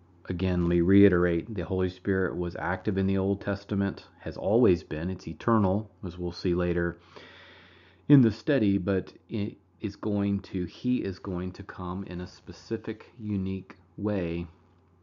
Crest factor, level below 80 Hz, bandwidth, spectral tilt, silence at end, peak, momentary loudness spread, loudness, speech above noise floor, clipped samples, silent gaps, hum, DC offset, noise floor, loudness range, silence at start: 20 dB; -52 dBFS; 7 kHz; -7.5 dB/octave; 0.5 s; -8 dBFS; 16 LU; -28 LUFS; 28 dB; under 0.1%; none; none; under 0.1%; -56 dBFS; 8 LU; 0.25 s